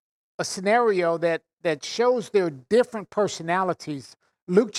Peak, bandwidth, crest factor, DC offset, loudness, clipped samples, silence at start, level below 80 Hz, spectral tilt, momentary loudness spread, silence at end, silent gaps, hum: -6 dBFS; 12.5 kHz; 18 dB; under 0.1%; -24 LUFS; under 0.1%; 0.4 s; -72 dBFS; -4.5 dB/octave; 11 LU; 0 s; 1.53-1.57 s, 4.42-4.47 s; none